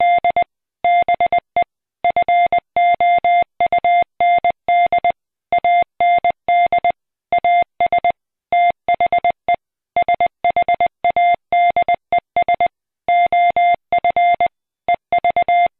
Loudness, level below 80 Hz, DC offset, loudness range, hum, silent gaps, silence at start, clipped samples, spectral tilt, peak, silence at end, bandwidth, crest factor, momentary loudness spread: -16 LUFS; -52 dBFS; under 0.1%; 2 LU; none; none; 0 s; under 0.1%; -7.5 dB/octave; -10 dBFS; 0.1 s; 4.1 kHz; 6 dB; 7 LU